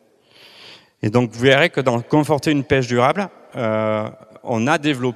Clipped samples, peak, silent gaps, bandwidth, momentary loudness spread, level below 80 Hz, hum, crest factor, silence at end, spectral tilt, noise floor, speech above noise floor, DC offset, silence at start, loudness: under 0.1%; 0 dBFS; none; 14 kHz; 11 LU; -54 dBFS; none; 20 dB; 0 s; -6 dB/octave; -50 dBFS; 32 dB; under 0.1%; 0.65 s; -18 LUFS